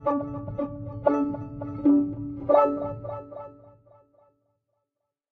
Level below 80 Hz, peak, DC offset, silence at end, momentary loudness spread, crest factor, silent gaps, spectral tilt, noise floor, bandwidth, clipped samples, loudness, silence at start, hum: -54 dBFS; -6 dBFS; under 0.1%; 1.6 s; 17 LU; 22 dB; none; -10.5 dB/octave; -83 dBFS; 4 kHz; under 0.1%; -26 LUFS; 0 s; none